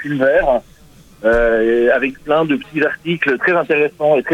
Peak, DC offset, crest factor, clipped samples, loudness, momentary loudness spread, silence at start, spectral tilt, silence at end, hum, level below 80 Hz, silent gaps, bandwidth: -2 dBFS; under 0.1%; 14 dB; under 0.1%; -15 LUFS; 5 LU; 0 s; -7 dB/octave; 0 s; none; -36 dBFS; none; 12 kHz